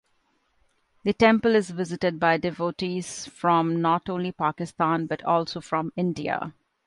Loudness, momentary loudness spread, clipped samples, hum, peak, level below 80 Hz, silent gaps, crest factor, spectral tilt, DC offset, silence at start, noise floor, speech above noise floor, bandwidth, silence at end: -25 LUFS; 10 LU; under 0.1%; none; -6 dBFS; -60 dBFS; none; 20 dB; -5.5 dB/octave; under 0.1%; 1.05 s; -69 dBFS; 45 dB; 11.5 kHz; 0.35 s